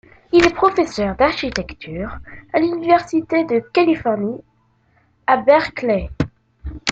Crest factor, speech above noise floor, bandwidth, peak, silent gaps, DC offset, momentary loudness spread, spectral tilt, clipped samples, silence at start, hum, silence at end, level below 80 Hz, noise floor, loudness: 18 dB; 42 dB; 7.8 kHz; 0 dBFS; none; under 0.1%; 14 LU; -5.5 dB/octave; under 0.1%; 0.35 s; none; 0 s; -40 dBFS; -59 dBFS; -18 LUFS